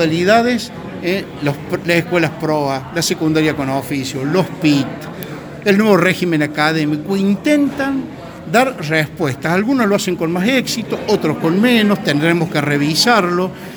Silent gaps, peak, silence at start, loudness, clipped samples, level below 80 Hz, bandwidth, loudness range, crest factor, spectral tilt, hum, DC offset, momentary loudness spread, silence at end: none; 0 dBFS; 0 s; -16 LUFS; under 0.1%; -50 dBFS; over 20 kHz; 3 LU; 16 dB; -5 dB/octave; none; under 0.1%; 9 LU; 0 s